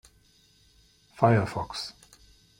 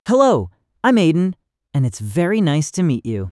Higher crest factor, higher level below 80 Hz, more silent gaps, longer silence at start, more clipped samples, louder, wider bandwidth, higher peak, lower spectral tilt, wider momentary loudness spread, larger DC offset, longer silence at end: first, 26 dB vs 16 dB; about the same, -58 dBFS vs -56 dBFS; neither; first, 1.2 s vs 0.05 s; neither; second, -27 LUFS vs -18 LUFS; first, 15.5 kHz vs 12 kHz; about the same, -4 dBFS vs -2 dBFS; about the same, -6.5 dB/octave vs -6.5 dB/octave; first, 14 LU vs 9 LU; neither; first, 0.7 s vs 0 s